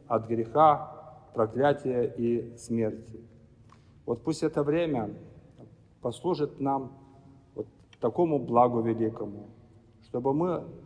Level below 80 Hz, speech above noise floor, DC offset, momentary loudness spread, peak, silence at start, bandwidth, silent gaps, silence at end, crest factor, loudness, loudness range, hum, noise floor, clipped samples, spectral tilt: -62 dBFS; 28 dB; under 0.1%; 20 LU; -8 dBFS; 0.1 s; 10.5 kHz; none; 0 s; 20 dB; -28 LUFS; 5 LU; none; -56 dBFS; under 0.1%; -7.5 dB/octave